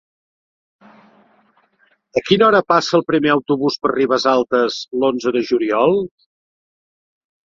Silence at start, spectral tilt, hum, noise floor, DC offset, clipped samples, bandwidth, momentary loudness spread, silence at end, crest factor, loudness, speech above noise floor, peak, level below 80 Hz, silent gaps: 2.15 s; -5 dB/octave; none; -60 dBFS; under 0.1%; under 0.1%; 7.6 kHz; 8 LU; 1.4 s; 18 dB; -16 LUFS; 44 dB; 0 dBFS; -60 dBFS; none